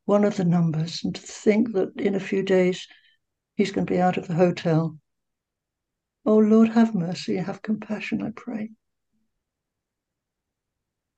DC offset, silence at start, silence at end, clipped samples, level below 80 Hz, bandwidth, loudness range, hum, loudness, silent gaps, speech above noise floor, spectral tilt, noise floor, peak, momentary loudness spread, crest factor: under 0.1%; 0.1 s; 2.45 s; under 0.1%; -64 dBFS; 8.4 kHz; 10 LU; none; -23 LUFS; none; 62 dB; -7 dB/octave; -84 dBFS; -6 dBFS; 13 LU; 18 dB